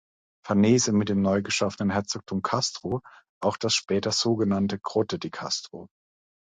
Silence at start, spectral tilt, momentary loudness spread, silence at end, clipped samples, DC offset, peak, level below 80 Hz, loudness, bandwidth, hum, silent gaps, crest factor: 0.45 s; -4.5 dB/octave; 10 LU; 0.65 s; under 0.1%; under 0.1%; -10 dBFS; -56 dBFS; -26 LUFS; 9.4 kHz; none; 3.29-3.41 s; 16 dB